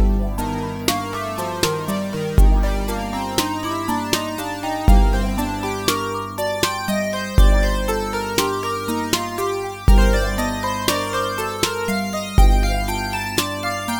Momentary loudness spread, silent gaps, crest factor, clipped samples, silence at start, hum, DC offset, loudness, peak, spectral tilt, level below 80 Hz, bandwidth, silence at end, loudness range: 7 LU; none; 18 dB; under 0.1%; 0 s; 50 Hz at -30 dBFS; 0.3%; -21 LUFS; 0 dBFS; -4.5 dB/octave; -22 dBFS; 20 kHz; 0 s; 2 LU